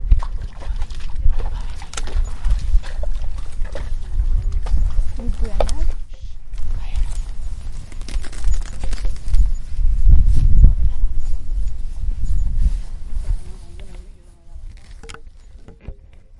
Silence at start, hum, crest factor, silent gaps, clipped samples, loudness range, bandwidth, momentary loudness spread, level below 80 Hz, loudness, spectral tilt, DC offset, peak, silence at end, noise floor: 0 s; none; 14 dB; none; under 0.1%; 9 LU; 10 kHz; 21 LU; -18 dBFS; -25 LUFS; -6 dB/octave; under 0.1%; 0 dBFS; 0.45 s; -39 dBFS